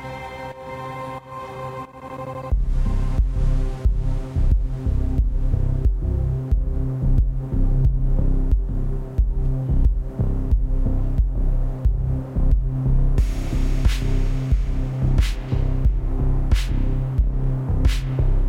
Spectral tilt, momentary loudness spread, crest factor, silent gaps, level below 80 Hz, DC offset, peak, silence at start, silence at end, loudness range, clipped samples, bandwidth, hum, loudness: -7.5 dB/octave; 10 LU; 14 dB; none; -20 dBFS; under 0.1%; -6 dBFS; 0 s; 0 s; 2 LU; under 0.1%; 8 kHz; none; -24 LUFS